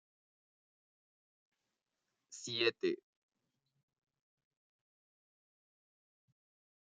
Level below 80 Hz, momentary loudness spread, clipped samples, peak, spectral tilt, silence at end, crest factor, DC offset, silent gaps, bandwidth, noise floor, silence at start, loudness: under -90 dBFS; 15 LU; under 0.1%; -18 dBFS; -2 dB/octave; 4 s; 28 dB; under 0.1%; none; 7.2 kHz; -89 dBFS; 2.3 s; -37 LUFS